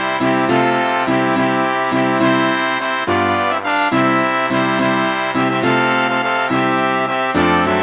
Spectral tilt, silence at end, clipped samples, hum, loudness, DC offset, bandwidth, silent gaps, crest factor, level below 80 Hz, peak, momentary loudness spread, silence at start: -9 dB/octave; 0 s; under 0.1%; none; -16 LUFS; under 0.1%; 4 kHz; none; 14 dB; -48 dBFS; -2 dBFS; 3 LU; 0 s